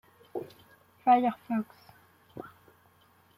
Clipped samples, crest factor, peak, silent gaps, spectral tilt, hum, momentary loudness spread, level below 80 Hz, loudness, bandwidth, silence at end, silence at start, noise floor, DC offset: under 0.1%; 22 dB; -12 dBFS; none; -7 dB/octave; none; 25 LU; -76 dBFS; -29 LUFS; 15 kHz; 0.9 s; 0.35 s; -63 dBFS; under 0.1%